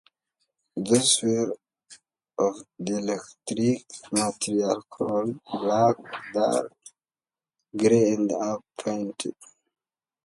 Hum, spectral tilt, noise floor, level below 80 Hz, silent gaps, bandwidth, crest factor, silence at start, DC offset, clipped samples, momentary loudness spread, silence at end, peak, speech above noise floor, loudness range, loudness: none; -4 dB/octave; under -90 dBFS; -68 dBFS; none; 11.5 kHz; 20 dB; 0.75 s; under 0.1%; under 0.1%; 14 LU; 0.9 s; -6 dBFS; over 65 dB; 3 LU; -26 LUFS